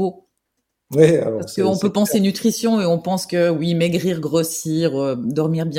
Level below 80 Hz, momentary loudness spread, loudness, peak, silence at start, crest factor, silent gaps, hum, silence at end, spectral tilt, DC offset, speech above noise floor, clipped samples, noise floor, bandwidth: -58 dBFS; 7 LU; -19 LUFS; -2 dBFS; 0 s; 18 dB; none; none; 0 s; -6 dB/octave; under 0.1%; 57 dB; under 0.1%; -75 dBFS; 17 kHz